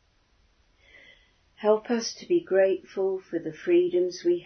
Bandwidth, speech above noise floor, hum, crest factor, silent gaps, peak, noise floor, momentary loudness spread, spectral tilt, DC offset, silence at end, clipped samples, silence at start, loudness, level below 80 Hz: 6.6 kHz; 40 dB; none; 18 dB; none; -8 dBFS; -65 dBFS; 8 LU; -4.5 dB/octave; under 0.1%; 0 s; under 0.1%; 1.6 s; -26 LUFS; -68 dBFS